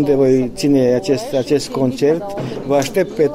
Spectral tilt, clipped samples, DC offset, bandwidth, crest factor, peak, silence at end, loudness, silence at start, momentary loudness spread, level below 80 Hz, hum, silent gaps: -6 dB/octave; under 0.1%; under 0.1%; 16 kHz; 12 dB; -2 dBFS; 0 s; -16 LUFS; 0 s; 6 LU; -44 dBFS; none; none